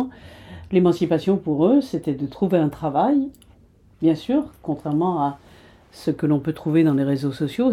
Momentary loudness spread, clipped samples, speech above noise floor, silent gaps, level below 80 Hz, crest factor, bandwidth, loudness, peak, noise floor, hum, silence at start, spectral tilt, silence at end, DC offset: 11 LU; under 0.1%; 32 dB; none; -54 dBFS; 16 dB; 14 kHz; -21 LUFS; -4 dBFS; -53 dBFS; none; 0 s; -8.5 dB/octave; 0 s; under 0.1%